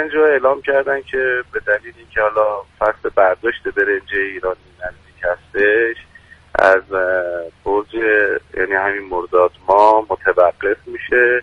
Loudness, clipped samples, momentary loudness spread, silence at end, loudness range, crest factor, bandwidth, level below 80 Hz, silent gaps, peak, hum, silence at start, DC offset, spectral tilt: -17 LUFS; under 0.1%; 11 LU; 0 s; 3 LU; 16 dB; 9.2 kHz; -46 dBFS; none; 0 dBFS; none; 0 s; under 0.1%; -5.5 dB/octave